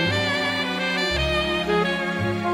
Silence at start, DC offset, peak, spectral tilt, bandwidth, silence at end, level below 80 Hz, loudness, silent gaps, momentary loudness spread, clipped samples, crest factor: 0 s; under 0.1%; -8 dBFS; -4.5 dB/octave; 16 kHz; 0 s; -38 dBFS; -22 LUFS; none; 3 LU; under 0.1%; 14 dB